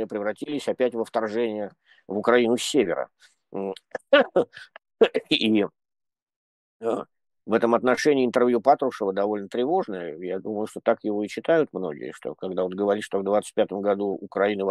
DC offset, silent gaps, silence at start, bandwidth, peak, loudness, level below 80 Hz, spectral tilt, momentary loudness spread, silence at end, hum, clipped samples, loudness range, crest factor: under 0.1%; 6.22-6.27 s, 6.36-6.80 s; 0 s; 12.5 kHz; -4 dBFS; -24 LUFS; -72 dBFS; -4.5 dB/octave; 12 LU; 0 s; none; under 0.1%; 3 LU; 20 dB